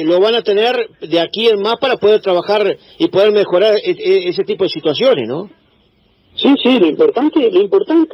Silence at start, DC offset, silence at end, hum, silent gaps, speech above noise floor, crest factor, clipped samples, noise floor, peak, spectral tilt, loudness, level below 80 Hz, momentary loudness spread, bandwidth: 0 s; under 0.1%; 0 s; none; none; 41 dB; 12 dB; under 0.1%; -54 dBFS; 0 dBFS; -6.5 dB/octave; -13 LUFS; -62 dBFS; 6 LU; 6.4 kHz